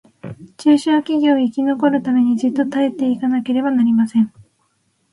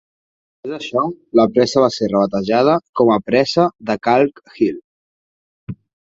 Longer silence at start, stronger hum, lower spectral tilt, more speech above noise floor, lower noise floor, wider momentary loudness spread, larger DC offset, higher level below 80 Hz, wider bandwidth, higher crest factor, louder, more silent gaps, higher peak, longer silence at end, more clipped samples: second, 0.25 s vs 0.65 s; neither; about the same, -6.5 dB/octave vs -6 dB/octave; second, 49 dB vs over 74 dB; second, -64 dBFS vs under -90 dBFS; second, 5 LU vs 19 LU; neither; second, -62 dBFS vs -56 dBFS; first, 11 kHz vs 7.8 kHz; about the same, 14 dB vs 16 dB; about the same, -17 LUFS vs -16 LUFS; second, none vs 2.89-2.93 s, 4.84-5.67 s; about the same, -2 dBFS vs -2 dBFS; first, 0.85 s vs 0.4 s; neither